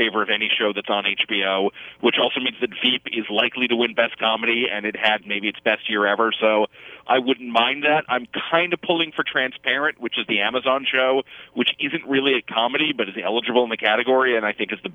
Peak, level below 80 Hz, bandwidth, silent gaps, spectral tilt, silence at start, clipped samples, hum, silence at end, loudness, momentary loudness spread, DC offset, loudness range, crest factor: -4 dBFS; -70 dBFS; 7 kHz; none; -5.5 dB/octave; 0 s; under 0.1%; none; 0 s; -20 LUFS; 5 LU; under 0.1%; 1 LU; 18 dB